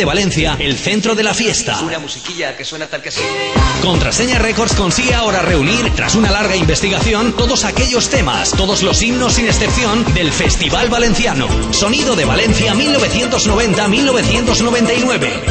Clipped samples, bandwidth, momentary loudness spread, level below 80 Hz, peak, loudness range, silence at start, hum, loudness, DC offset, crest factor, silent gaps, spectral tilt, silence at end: under 0.1%; 8.8 kHz; 5 LU; -24 dBFS; 0 dBFS; 3 LU; 0 s; none; -13 LUFS; under 0.1%; 12 dB; none; -3.5 dB/octave; 0 s